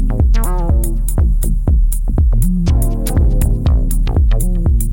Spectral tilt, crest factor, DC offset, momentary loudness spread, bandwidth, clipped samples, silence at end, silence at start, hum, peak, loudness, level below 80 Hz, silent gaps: -7 dB/octave; 8 dB; under 0.1%; 2 LU; 17.5 kHz; under 0.1%; 0 s; 0 s; none; -4 dBFS; -16 LUFS; -12 dBFS; none